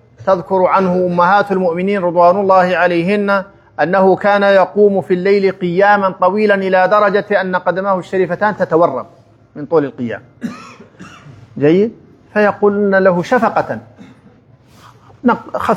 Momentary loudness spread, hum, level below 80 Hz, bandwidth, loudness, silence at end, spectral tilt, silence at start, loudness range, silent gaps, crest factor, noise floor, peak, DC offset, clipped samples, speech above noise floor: 10 LU; none; -58 dBFS; 10 kHz; -13 LUFS; 0 s; -7.5 dB/octave; 0.2 s; 6 LU; none; 14 dB; -46 dBFS; 0 dBFS; under 0.1%; under 0.1%; 33 dB